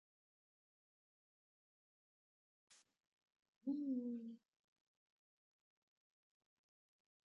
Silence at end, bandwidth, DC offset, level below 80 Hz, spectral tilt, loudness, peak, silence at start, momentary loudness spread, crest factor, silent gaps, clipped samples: 2.9 s; 7 kHz; under 0.1%; under -90 dBFS; -8 dB/octave; -46 LUFS; -34 dBFS; 2.7 s; 14 LU; 20 dB; 3.07-3.17 s, 3.36-3.61 s; under 0.1%